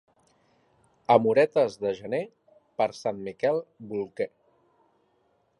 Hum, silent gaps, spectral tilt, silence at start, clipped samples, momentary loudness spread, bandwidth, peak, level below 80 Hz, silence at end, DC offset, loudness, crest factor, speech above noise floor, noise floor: none; none; -6 dB/octave; 1.1 s; under 0.1%; 14 LU; 11.5 kHz; -4 dBFS; -72 dBFS; 1.3 s; under 0.1%; -27 LUFS; 24 dB; 43 dB; -69 dBFS